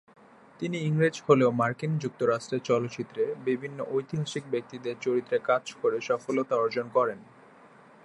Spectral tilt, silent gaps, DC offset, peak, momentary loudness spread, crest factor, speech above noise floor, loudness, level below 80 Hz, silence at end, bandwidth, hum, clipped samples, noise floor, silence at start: -6.5 dB/octave; none; under 0.1%; -6 dBFS; 9 LU; 22 dB; 26 dB; -28 LUFS; -72 dBFS; 0.8 s; 11 kHz; none; under 0.1%; -54 dBFS; 0.6 s